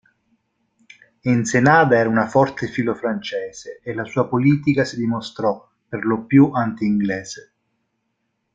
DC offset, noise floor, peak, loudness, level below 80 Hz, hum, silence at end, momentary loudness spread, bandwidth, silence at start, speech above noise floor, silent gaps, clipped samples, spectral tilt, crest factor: under 0.1%; -73 dBFS; -2 dBFS; -19 LUFS; -58 dBFS; none; 1.15 s; 15 LU; 9.2 kHz; 1.25 s; 54 dB; none; under 0.1%; -6.5 dB/octave; 18 dB